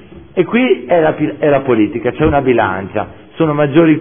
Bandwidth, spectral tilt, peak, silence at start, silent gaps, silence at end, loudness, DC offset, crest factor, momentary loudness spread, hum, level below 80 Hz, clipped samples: 3.6 kHz; -11.5 dB/octave; 0 dBFS; 0.1 s; none; 0 s; -14 LUFS; 0.3%; 12 dB; 9 LU; none; -38 dBFS; under 0.1%